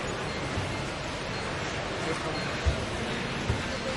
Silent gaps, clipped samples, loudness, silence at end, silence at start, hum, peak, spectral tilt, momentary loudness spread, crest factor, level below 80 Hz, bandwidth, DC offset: none; under 0.1%; -31 LUFS; 0 s; 0 s; none; -14 dBFS; -4.5 dB/octave; 3 LU; 18 dB; -42 dBFS; 11.5 kHz; under 0.1%